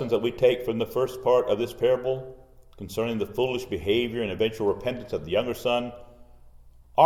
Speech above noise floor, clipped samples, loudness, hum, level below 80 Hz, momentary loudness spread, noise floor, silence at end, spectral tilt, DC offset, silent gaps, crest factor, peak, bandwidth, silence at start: 24 dB; under 0.1%; -26 LUFS; none; -52 dBFS; 8 LU; -50 dBFS; 0 s; -6 dB/octave; under 0.1%; none; 22 dB; -4 dBFS; 17.5 kHz; 0 s